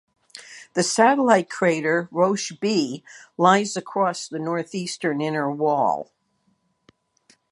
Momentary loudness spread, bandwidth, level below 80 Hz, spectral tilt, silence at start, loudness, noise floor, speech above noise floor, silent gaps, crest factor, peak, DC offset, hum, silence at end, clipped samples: 13 LU; 11.5 kHz; -74 dBFS; -4.5 dB/octave; 0.35 s; -22 LUFS; -68 dBFS; 47 dB; none; 20 dB; -2 dBFS; under 0.1%; none; 1.5 s; under 0.1%